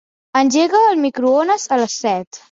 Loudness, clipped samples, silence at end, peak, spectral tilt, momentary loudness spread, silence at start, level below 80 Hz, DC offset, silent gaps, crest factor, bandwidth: -16 LUFS; under 0.1%; 0.15 s; -2 dBFS; -3 dB/octave; 8 LU; 0.35 s; -64 dBFS; under 0.1%; 2.27-2.31 s; 14 dB; 7.8 kHz